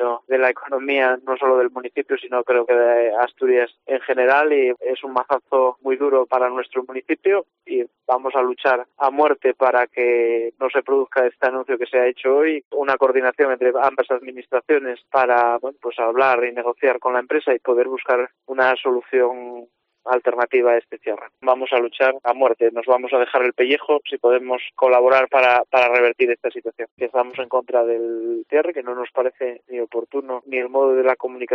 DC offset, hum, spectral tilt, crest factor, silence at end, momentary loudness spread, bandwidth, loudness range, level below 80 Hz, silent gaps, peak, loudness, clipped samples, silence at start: under 0.1%; none; 0 dB/octave; 16 dB; 0 s; 10 LU; 6 kHz; 4 LU; -76 dBFS; 12.65-12.71 s, 26.91-26.97 s; -4 dBFS; -19 LUFS; under 0.1%; 0 s